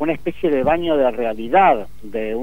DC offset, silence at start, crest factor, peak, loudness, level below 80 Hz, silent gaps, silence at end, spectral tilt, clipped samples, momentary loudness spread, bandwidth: 3%; 0 s; 16 dB; -4 dBFS; -18 LUFS; -44 dBFS; none; 0 s; -7 dB/octave; under 0.1%; 11 LU; 16 kHz